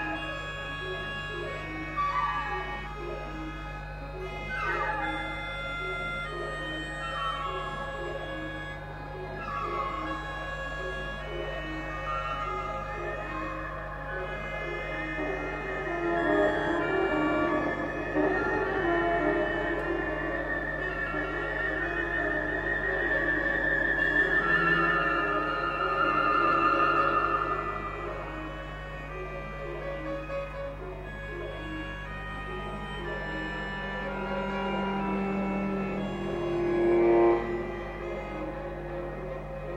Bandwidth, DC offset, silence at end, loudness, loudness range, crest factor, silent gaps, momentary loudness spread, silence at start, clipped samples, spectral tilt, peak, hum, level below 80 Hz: 9.8 kHz; under 0.1%; 0 s; -30 LUFS; 10 LU; 18 dB; none; 13 LU; 0 s; under 0.1%; -6.5 dB/octave; -12 dBFS; none; -44 dBFS